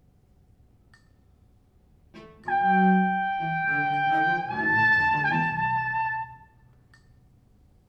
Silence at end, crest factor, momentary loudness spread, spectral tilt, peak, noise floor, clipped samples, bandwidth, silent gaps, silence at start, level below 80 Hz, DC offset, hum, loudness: 1.5 s; 16 dB; 9 LU; -7.5 dB/octave; -10 dBFS; -59 dBFS; under 0.1%; 6.6 kHz; none; 2.15 s; -60 dBFS; under 0.1%; none; -24 LUFS